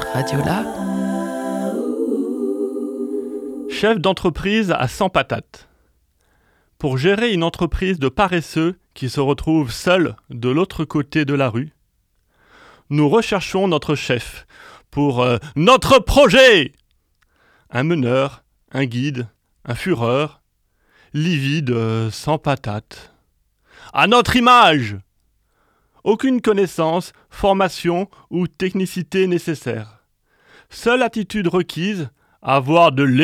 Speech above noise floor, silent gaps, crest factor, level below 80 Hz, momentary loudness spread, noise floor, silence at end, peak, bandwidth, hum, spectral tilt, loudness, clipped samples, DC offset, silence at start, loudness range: 47 dB; none; 18 dB; -40 dBFS; 14 LU; -64 dBFS; 0 s; 0 dBFS; 17 kHz; none; -5.5 dB/octave; -18 LUFS; under 0.1%; under 0.1%; 0 s; 8 LU